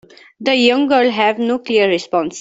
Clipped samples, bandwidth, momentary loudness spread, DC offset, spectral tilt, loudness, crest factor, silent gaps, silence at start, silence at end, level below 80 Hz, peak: under 0.1%; 8 kHz; 7 LU; under 0.1%; -4 dB/octave; -15 LUFS; 14 dB; none; 0.4 s; 0 s; -62 dBFS; -2 dBFS